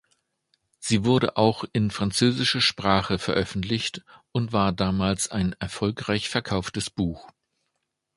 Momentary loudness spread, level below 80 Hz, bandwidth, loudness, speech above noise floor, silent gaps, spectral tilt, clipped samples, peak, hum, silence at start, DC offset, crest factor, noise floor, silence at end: 9 LU; -48 dBFS; 11.5 kHz; -25 LUFS; 54 dB; none; -4.5 dB/octave; under 0.1%; -4 dBFS; none; 0.8 s; under 0.1%; 22 dB; -79 dBFS; 0.9 s